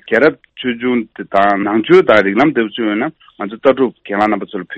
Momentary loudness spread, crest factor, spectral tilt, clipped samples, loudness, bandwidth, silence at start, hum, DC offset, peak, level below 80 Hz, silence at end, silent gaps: 11 LU; 14 dB; -7 dB/octave; under 0.1%; -14 LUFS; 7.8 kHz; 0.05 s; none; under 0.1%; 0 dBFS; -56 dBFS; 0 s; none